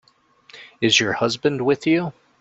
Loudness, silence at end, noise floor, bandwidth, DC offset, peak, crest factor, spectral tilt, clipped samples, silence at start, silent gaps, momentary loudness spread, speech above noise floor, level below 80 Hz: -19 LUFS; 0.3 s; -54 dBFS; 8.2 kHz; under 0.1%; -2 dBFS; 20 dB; -4 dB/octave; under 0.1%; 0.55 s; none; 6 LU; 35 dB; -62 dBFS